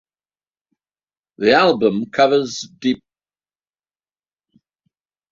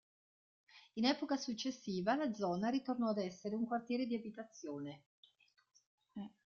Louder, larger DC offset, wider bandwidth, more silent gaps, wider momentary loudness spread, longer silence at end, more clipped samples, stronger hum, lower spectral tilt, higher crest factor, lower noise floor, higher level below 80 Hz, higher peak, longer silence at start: first, -17 LUFS vs -39 LUFS; neither; about the same, 7.6 kHz vs 7.2 kHz; second, none vs 5.06-5.23 s, 5.86-5.98 s; second, 10 LU vs 14 LU; first, 2.35 s vs 0.15 s; neither; neither; about the same, -4.5 dB/octave vs -4 dB/octave; about the same, 20 dB vs 20 dB; about the same, under -90 dBFS vs under -90 dBFS; first, -62 dBFS vs -80 dBFS; first, -2 dBFS vs -22 dBFS; first, 1.4 s vs 0.75 s